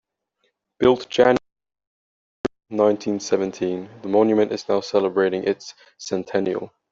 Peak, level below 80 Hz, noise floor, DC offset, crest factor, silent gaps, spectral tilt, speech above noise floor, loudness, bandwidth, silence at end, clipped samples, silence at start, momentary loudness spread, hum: -2 dBFS; -58 dBFS; -71 dBFS; under 0.1%; 20 dB; 1.87-2.44 s; -5.5 dB/octave; 51 dB; -22 LUFS; 7.8 kHz; 0.25 s; under 0.1%; 0.8 s; 13 LU; none